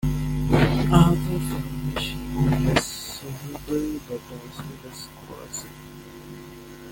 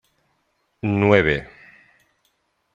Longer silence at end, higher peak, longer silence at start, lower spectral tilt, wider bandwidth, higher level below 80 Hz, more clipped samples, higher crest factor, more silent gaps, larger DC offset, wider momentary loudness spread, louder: second, 0 s vs 1.3 s; about the same, -2 dBFS vs -2 dBFS; second, 0 s vs 0.85 s; second, -6 dB/octave vs -8 dB/octave; first, 17 kHz vs 7.4 kHz; first, -36 dBFS vs -48 dBFS; neither; about the same, 22 dB vs 22 dB; neither; neither; first, 22 LU vs 15 LU; second, -24 LUFS vs -19 LUFS